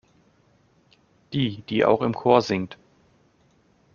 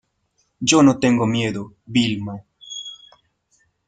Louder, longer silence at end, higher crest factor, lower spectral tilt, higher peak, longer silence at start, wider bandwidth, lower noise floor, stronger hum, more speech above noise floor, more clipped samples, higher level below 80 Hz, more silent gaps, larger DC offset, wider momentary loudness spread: second, -23 LUFS vs -18 LUFS; first, 1.2 s vs 0.95 s; about the same, 24 dB vs 20 dB; about the same, -5 dB/octave vs -4.5 dB/octave; about the same, -2 dBFS vs -2 dBFS; first, 1.3 s vs 0.6 s; second, 7.2 kHz vs 9.6 kHz; second, -62 dBFS vs -68 dBFS; neither; second, 40 dB vs 50 dB; neither; about the same, -62 dBFS vs -58 dBFS; neither; neither; second, 10 LU vs 19 LU